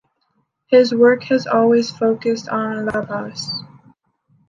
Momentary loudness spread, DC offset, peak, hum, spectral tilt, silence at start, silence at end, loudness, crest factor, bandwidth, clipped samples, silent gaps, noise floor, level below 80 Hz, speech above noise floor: 12 LU; under 0.1%; -2 dBFS; none; -5 dB/octave; 0.7 s; 0.85 s; -17 LUFS; 16 dB; 7.6 kHz; under 0.1%; none; -67 dBFS; -58 dBFS; 51 dB